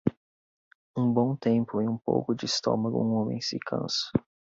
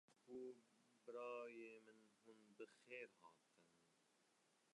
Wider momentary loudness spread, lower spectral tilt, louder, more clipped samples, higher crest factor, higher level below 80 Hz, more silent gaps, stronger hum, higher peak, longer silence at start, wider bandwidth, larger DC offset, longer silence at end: second, 6 LU vs 12 LU; first, -5.5 dB/octave vs -4 dB/octave; first, -28 LUFS vs -58 LUFS; neither; about the same, 20 dB vs 20 dB; first, -60 dBFS vs under -90 dBFS; first, 0.17-0.94 s vs none; neither; first, -8 dBFS vs -42 dBFS; about the same, 0.05 s vs 0.1 s; second, 7.8 kHz vs 11 kHz; neither; first, 0.4 s vs 0 s